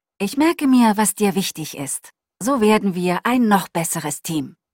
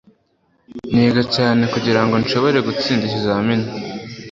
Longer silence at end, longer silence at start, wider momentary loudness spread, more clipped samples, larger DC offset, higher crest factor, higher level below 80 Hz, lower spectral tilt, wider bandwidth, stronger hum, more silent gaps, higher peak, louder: first, 0.2 s vs 0 s; second, 0.2 s vs 0.7 s; about the same, 12 LU vs 13 LU; neither; neither; about the same, 16 dB vs 16 dB; second, -58 dBFS vs -50 dBFS; second, -4.5 dB/octave vs -6.5 dB/octave; first, 16.5 kHz vs 7.6 kHz; neither; neither; about the same, -4 dBFS vs -2 dBFS; about the same, -19 LUFS vs -17 LUFS